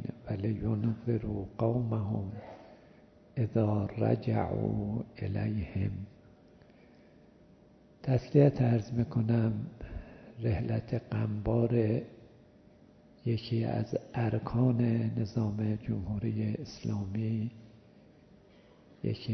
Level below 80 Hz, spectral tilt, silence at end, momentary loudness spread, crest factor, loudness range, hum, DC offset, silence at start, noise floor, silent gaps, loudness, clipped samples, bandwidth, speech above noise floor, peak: -54 dBFS; -9.5 dB/octave; 0 s; 12 LU; 22 dB; 6 LU; none; under 0.1%; 0 s; -59 dBFS; none; -32 LUFS; under 0.1%; 6.2 kHz; 29 dB; -10 dBFS